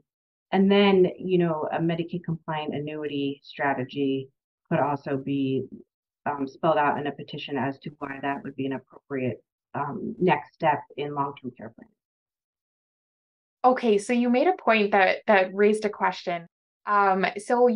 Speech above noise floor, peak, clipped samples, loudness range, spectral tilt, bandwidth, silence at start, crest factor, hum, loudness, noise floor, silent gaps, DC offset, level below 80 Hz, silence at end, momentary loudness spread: over 65 dB; -6 dBFS; under 0.1%; 7 LU; -6.5 dB/octave; 11 kHz; 0.5 s; 20 dB; none; -25 LUFS; under -90 dBFS; 4.44-4.58 s, 5.94-6.03 s, 9.52-9.58 s, 12.05-12.26 s, 12.44-12.53 s, 12.61-13.57 s, 16.52-16.80 s; under 0.1%; -70 dBFS; 0 s; 12 LU